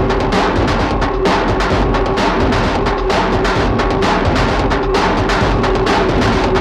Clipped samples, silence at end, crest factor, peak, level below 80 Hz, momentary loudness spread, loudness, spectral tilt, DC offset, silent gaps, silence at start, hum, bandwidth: under 0.1%; 0 s; 12 dB; -2 dBFS; -22 dBFS; 2 LU; -14 LUFS; -6 dB/octave; under 0.1%; none; 0 s; none; 11.5 kHz